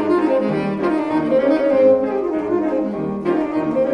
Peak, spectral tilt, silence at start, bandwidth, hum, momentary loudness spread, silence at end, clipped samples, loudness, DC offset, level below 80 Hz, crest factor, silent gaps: -4 dBFS; -8.5 dB/octave; 0 s; 9.4 kHz; none; 7 LU; 0 s; under 0.1%; -18 LUFS; under 0.1%; -52 dBFS; 14 dB; none